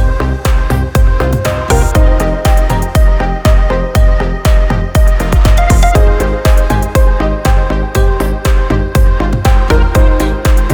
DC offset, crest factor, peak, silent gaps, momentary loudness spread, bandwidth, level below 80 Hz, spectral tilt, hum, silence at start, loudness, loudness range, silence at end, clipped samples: under 0.1%; 8 dB; 0 dBFS; none; 4 LU; 19 kHz; -10 dBFS; -6 dB/octave; none; 0 s; -12 LUFS; 1 LU; 0 s; under 0.1%